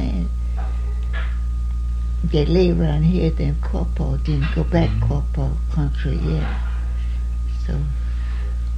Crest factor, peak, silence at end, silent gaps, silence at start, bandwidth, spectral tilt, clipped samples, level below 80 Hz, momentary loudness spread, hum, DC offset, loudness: 16 dB; -4 dBFS; 0 s; none; 0 s; 6.4 kHz; -8.5 dB/octave; under 0.1%; -22 dBFS; 7 LU; none; under 0.1%; -22 LUFS